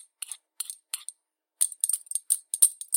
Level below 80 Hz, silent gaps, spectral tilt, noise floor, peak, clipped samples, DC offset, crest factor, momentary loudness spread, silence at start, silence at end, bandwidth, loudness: under -90 dBFS; none; 9 dB/octave; -70 dBFS; -2 dBFS; under 0.1%; under 0.1%; 28 dB; 17 LU; 0.3 s; 0 s; 17 kHz; -26 LUFS